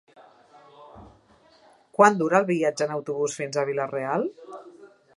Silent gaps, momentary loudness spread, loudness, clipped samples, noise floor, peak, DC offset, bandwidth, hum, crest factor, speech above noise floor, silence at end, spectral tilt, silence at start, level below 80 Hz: none; 17 LU; -24 LUFS; under 0.1%; -57 dBFS; -2 dBFS; under 0.1%; 11.5 kHz; none; 24 dB; 34 dB; 0.3 s; -5 dB/octave; 0.8 s; -68 dBFS